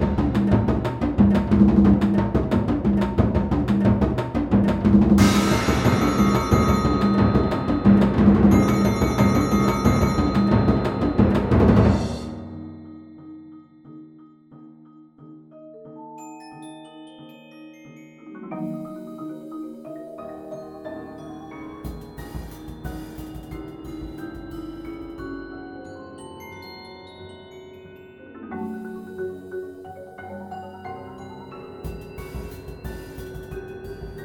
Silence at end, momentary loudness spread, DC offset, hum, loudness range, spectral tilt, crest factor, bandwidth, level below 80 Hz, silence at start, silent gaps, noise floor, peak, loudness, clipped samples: 0 s; 23 LU; under 0.1%; none; 20 LU; -7.5 dB/octave; 20 dB; 15 kHz; -34 dBFS; 0 s; none; -48 dBFS; -4 dBFS; -19 LUFS; under 0.1%